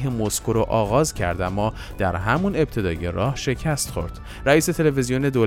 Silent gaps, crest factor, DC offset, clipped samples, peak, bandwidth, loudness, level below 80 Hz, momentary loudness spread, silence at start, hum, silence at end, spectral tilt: none; 18 dB; under 0.1%; under 0.1%; -4 dBFS; 16.5 kHz; -22 LUFS; -36 dBFS; 7 LU; 0 s; none; 0 s; -5.5 dB/octave